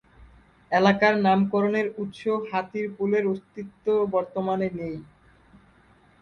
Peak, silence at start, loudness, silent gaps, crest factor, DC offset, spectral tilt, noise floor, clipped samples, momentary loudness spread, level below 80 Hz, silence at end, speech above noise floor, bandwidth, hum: -6 dBFS; 0.2 s; -25 LUFS; none; 20 dB; under 0.1%; -7 dB/octave; -58 dBFS; under 0.1%; 13 LU; -60 dBFS; 1.15 s; 33 dB; 6.8 kHz; none